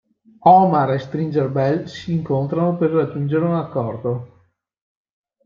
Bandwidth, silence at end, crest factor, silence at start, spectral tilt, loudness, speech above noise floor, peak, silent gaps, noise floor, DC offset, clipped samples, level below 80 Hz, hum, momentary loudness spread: 7.2 kHz; 1.2 s; 18 dB; 0.45 s; -9 dB/octave; -19 LUFS; 41 dB; -2 dBFS; none; -59 dBFS; under 0.1%; under 0.1%; -60 dBFS; none; 12 LU